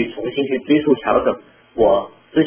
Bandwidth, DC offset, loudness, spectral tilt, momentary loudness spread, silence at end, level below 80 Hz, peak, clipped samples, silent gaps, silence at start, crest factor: 3.5 kHz; under 0.1%; -18 LUFS; -10 dB/octave; 7 LU; 0 s; -48 dBFS; -2 dBFS; under 0.1%; none; 0 s; 16 dB